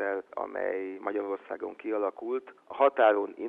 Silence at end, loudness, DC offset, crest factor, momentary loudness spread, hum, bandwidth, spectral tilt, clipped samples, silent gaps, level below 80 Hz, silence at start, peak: 0 s; -30 LUFS; under 0.1%; 20 dB; 13 LU; none; 4 kHz; -6.5 dB/octave; under 0.1%; none; -78 dBFS; 0 s; -10 dBFS